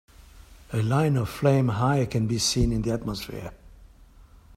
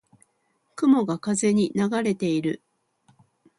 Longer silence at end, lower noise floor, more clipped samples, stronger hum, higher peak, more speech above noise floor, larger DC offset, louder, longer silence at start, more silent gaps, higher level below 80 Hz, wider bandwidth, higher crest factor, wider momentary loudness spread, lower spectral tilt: second, 0 s vs 1 s; second, -51 dBFS vs -70 dBFS; neither; neither; about the same, -8 dBFS vs -8 dBFS; second, 27 dB vs 48 dB; neither; about the same, -25 LUFS vs -23 LUFS; second, 0.35 s vs 0.75 s; neither; first, -40 dBFS vs -68 dBFS; first, 16 kHz vs 11.5 kHz; about the same, 18 dB vs 18 dB; first, 12 LU vs 9 LU; about the same, -5.5 dB/octave vs -5.5 dB/octave